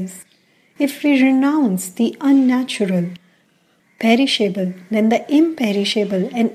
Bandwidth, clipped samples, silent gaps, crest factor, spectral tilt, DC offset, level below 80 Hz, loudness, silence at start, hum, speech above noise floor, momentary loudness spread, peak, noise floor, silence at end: 15.5 kHz; under 0.1%; none; 14 dB; -5 dB/octave; under 0.1%; -70 dBFS; -17 LUFS; 0 s; none; 42 dB; 8 LU; -2 dBFS; -59 dBFS; 0 s